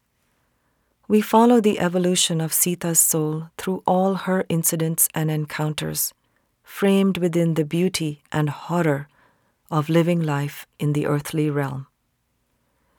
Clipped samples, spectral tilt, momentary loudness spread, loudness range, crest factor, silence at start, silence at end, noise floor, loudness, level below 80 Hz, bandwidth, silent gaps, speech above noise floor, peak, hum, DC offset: under 0.1%; -4.5 dB/octave; 10 LU; 5 LU; 20 dB; 1.1 s; 1.15 s; -70 dBFS; -21 LUFS; -62 dBFS; over 20 kHz; none; 50 dB; -2 dBFS; none; under 0.1%